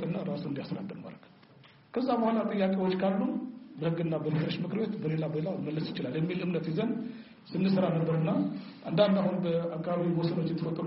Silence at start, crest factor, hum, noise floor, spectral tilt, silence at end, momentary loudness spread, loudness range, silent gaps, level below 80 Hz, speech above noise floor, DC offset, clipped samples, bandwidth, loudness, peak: 0 s; 20 dB; none; -57 dBFS; -7 dB/octave; 0 s; 11 LU; 3 LU; none; -70 dBFS; 27 dB; under 0.1%; under 0.1%; 5.8 kHz; -31 LUFS; -12 dBFS